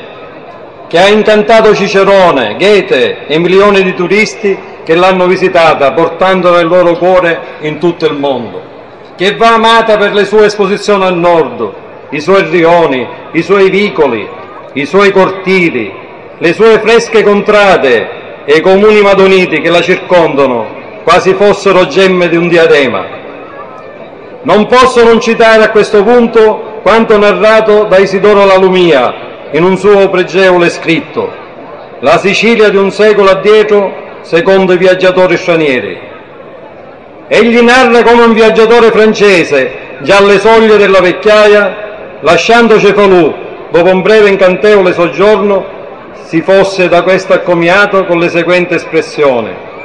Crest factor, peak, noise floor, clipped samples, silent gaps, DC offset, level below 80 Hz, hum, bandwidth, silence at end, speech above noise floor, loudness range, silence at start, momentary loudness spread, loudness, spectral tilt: 6 dB; 0 dBFS; -30 dBFS; 3%; none; 0.8%; -40 dBFS; none; 11 kHz; 0 s; 24 dB; 4 LU; 0 s; 13 LU; -6 LUFS; -5 dB/octave